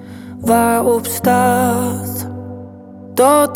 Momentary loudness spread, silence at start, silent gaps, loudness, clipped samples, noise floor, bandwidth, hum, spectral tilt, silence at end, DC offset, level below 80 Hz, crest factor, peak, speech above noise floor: 20 LU; 0 s; none; -15 LUFS; under 0.1%; -35 dBFS; 19.5 kHz; none; -5 dB/octave; 0 s; under 0.1%; -52 dBFS; 14 dB; -2 dBFS; 21 dB